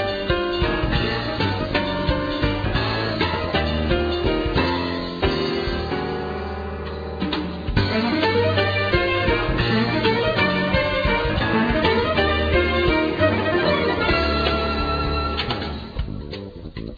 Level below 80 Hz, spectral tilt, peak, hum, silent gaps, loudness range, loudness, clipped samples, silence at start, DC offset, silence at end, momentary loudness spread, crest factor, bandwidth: -32 dBFS; -7.5 dB/octave; -4 dBFS; none; none; 4 LU; -21 LUFS; under 0.1%; 0 s; under 0.1%; 0 s; 9 LU; 16 dB; 5 kHz